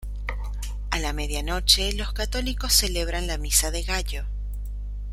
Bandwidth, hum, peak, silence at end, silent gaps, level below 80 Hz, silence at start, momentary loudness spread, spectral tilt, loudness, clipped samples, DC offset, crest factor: 15.5 kHz; 50 Hz at -30 dBFS; -2 dBFS; 0 s; none; -28 dBFS; 0 s; 15 LU; -2 dB/octave; -24 LUFS; under 0.1%; under 0.1%; 22 dB